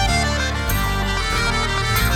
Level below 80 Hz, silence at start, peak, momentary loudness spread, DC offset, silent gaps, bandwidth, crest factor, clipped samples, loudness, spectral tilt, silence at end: -24 dBFS; 0 s; -6 dBFS; 3 LU; under 0.1%; none; 20 kHz; 14 dB; under 0.1%; -20 LUFS; -3.5 dB/octave; 0 s